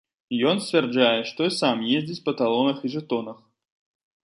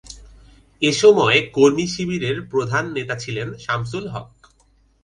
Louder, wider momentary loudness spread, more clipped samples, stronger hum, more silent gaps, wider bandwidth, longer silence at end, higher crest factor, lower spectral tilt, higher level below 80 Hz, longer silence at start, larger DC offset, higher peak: second, -23 LUFS vs -19 LUFS; second, 9 LU vs 14 LU; neither; neither; neither; about the same, 11.5 kHz vs 10.5 kHz; about the same, 0.9 s vs 0.8 s; about the same, 18 dB vs 20 dB; about the same, -5 dB/octave vs -4.5 dB/octave; second, -72 dBFS vs -50 dBFS; first, 0.3 s vs 0.1 s; neither; second, -6 dBFS vs -2 dBFS